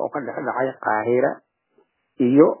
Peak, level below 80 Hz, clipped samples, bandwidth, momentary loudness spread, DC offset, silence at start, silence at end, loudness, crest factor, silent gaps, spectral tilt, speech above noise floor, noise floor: -2 dBFS; -72 dBFS; under 0.1%; 3.2 kHz; 12 LU; under 0.1%; 0 s; 0.05 s; -21 LUFS; 20 dB; none; -11.5 dB/octave; 44 dB; -64 dBFS